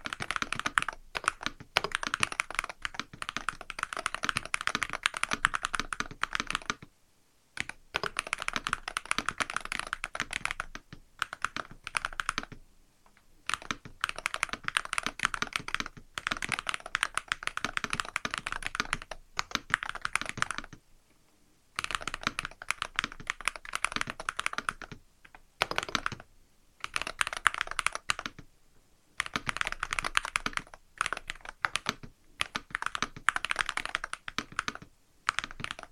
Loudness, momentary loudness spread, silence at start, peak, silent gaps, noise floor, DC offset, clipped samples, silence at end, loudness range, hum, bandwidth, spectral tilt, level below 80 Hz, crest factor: -33 LUFS; 9 LU; 0 s; -2 dBFS; none; -68 dBFS; under 0.1%; under 0.1%; 0.05 s; 3 LU; none; 16 kHz; -1 dB/octave; -52 dBFS; 34 dB